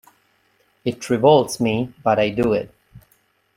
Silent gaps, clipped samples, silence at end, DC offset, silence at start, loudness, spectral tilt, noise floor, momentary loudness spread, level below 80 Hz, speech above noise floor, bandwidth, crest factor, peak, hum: none; under 0.1%; 0.6 s; under 0.1%; 0.85 s; -19 LUFS; -5.5 dB/octave; -62 dBFS; 13 LU; -52 dBFS; 44 dB; 16 kHz; 20 dB; -2 dBFS; none